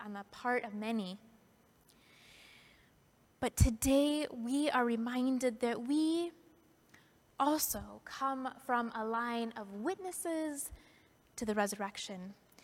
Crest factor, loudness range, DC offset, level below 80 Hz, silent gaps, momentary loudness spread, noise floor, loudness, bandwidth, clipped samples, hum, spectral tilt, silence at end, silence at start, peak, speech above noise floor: 22 dB; 7 LU; under 0.1%; -50 dBFS; none; 13 LU; -68 dBFS; -36 LUFS; 17.5 kHz; under 0.1%; none; -4.5 dB/octave; 0.3 s; 0 s; -14 dBFS; 33 dB